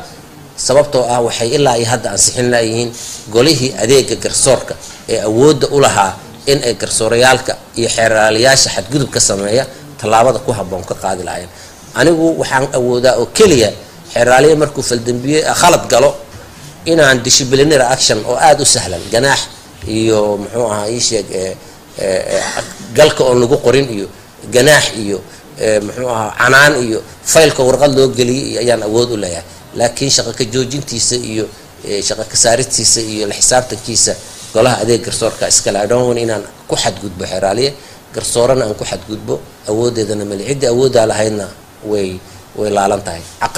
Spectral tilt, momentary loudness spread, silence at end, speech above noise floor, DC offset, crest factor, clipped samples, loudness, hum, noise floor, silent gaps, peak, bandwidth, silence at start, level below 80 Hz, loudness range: -3 dB/octave; 13 LU; 0 s; 22 dB; under 0.1%; 12 dB; 0.1%; -12 LUFS; none; -35 dBFS; none; 0 dBFS; 16.5 kHz; 0 s; -38 dBFS; 5 LU